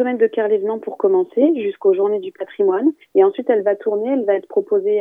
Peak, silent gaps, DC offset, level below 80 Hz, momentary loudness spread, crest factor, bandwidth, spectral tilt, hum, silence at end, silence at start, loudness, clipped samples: -2 dBFS; none; under 0.1%; -82 dBFS; 5 LU; 16 dB; 3.7 kHz; -8.5 dB/octave; none; 0 s; 0 s; -18 LUFS; under 0.1%